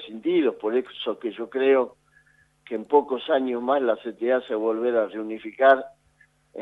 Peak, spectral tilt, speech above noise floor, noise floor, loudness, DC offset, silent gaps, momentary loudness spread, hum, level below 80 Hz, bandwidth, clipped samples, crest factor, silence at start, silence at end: -4 dBFS; -6.5 dB/octave; 38 dB; -62 dBFS; -24 LUFS; under 0.1%; none; 12 LU; none; -72 dBFS; 4.3 kHz; under 0.1%; 20 dB; 0 s; 0 s